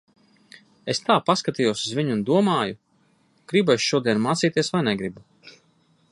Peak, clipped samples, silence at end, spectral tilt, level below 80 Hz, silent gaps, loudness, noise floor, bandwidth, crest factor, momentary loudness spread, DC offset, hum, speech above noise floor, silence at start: -4 dBFS; under 0.1%; 0.6 s; -5 dB/octave; -64 dBFS; none; -22 LUFS; -63 dBFS; 11.5 kHz; 20 dB; 9 LU; under 0.1%; none; 41 dB; 0.85 s